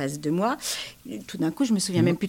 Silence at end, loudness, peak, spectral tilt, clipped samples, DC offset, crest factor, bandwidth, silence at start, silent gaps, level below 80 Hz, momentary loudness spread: 0 s; -26 LUFS; -10 dBFS; -5 dB/octave; under 0.1%; under 0.1%; 16 dB; 17 kHz; 0 s; none; -60 dBFS; 14 LU